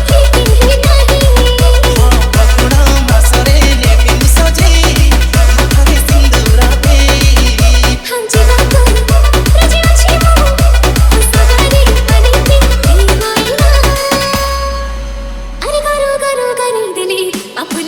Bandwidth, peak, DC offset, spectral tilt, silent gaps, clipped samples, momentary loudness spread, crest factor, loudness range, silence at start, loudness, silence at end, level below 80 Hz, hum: 18 kHz; 0 dBFS; under 0.1%; -4.5 dB/octave; none; 0.2%; 7 LU; 8 dB; 4 LU; 0 s; -9 LUFS; 0 s; -8 dBFS; none